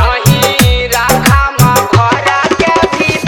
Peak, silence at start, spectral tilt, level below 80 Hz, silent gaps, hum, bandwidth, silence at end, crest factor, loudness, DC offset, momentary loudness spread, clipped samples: 0 dBFS; 0 s; -4.5 dB/octave; -20 dBFS; none; none; 19.5 kHz; 0 s; 10 dB; -9 LUFS; under 0.1%; 2 LU; 0.3%